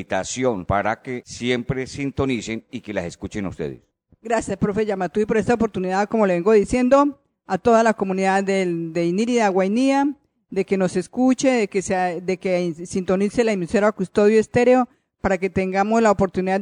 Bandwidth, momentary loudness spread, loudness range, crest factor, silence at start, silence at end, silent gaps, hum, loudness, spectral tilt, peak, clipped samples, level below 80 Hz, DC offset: 11 kHz; 11 LU; 7 LU; 16 dB; 0 s; 0 s; none; none; -21 LUFS; -6 dB/octave; -6 dBFS; under 0.1%; -48 dBFS; under 0.1%